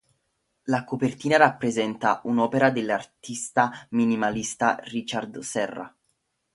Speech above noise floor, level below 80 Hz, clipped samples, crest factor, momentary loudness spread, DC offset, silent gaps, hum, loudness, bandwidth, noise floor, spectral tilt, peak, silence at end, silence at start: 50 dB; -64 dBFS; under 0.1%; 24 dB; 11 LU; under 0.1%; none; none; -25 LUFS; 11.5 kHz; -75 dBFS; -4.5 dB/octave; -2 dBFS; 0.65 s; 0.65 s